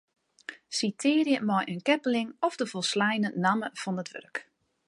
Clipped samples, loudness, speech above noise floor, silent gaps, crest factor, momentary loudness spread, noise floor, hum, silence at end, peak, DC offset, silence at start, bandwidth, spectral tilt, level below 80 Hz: under 0.1%; -28 LUFS; 19 dB; none; 20 dB; 14 LU; -47 dBFS; none; 0.45 s; -10 dBFS; under 0.1%; 0.5 s; 11.5 kHz; -4.5 dB/octave; -80 dBFS